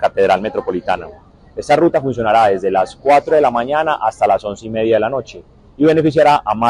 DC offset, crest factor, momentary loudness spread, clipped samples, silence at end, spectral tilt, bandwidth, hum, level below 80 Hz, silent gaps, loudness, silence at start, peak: under 0.1%; 12 dB; 11 LU; under 0.1%; 0 s; -6 dB/octave; 12 kHz; none; -46 dBFS; none; -15 LUFS; 0 s; -2 dBFS